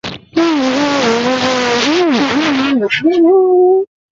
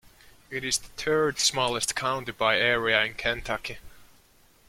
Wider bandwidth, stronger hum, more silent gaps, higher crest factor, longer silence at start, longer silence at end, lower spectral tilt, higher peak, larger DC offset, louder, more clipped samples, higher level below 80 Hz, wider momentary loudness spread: second, 7.8 kHz vs 16.5 kHz; neither; neither; second, 10 dB vs 22 dB; second, 0.05 s vs 0.5 s; second, 0.25 s vs 0.65 s; first, -4 dB/octave vs -2 dB/octave; first, -2 dBFS vs -6 dBFS; neither; first, -12 LUFS vs -25 LUFS; neither; about the same, -52 dBFS vs -52 dBFS; second, 4 LU vs 11 LU